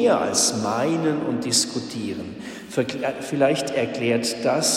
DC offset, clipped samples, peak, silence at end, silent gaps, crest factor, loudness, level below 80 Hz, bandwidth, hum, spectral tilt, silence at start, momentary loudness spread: under 0.1%; under 0.1%; -6 dBFS; 0 s; none; 16 dB; -22 LUFS; -62 dBFS; 16 kHz; none; -3 dB/octave; 0 s; 10 LU